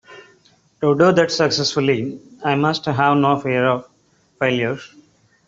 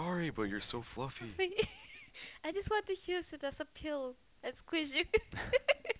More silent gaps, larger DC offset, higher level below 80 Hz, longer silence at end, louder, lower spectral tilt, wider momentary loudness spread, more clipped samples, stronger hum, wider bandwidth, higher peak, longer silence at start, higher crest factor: neither; neither; about the same, -58 dBFS vs -58 dBFS; first, 0.6 s vs 0 s; first, -18 LUFS vs -38 LUFS; first, -5.5 dB/octave vs -3 dB/octave; second, 10 LU vs 13 LU; neither; neither; first, 7.8 kHz vs 4 kHz; first, -2 dBFS vs -16 dBFS; about the same, 0.1 s vs 0 s; second, 16 dB vs 22 dB